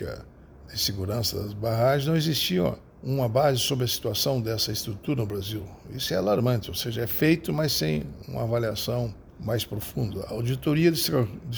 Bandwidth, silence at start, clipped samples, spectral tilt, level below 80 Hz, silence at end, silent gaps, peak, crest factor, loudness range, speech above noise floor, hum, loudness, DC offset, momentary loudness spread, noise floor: over 20 kHz; 0 s; under 0.1%; -5 dB/octave; -50 dBFS; 0 s; none; -10 dBFS; 16 dB; 2 LU; 21 dB; none; -26 LUFS; under 0.1%; 10 LU; -47 dBFS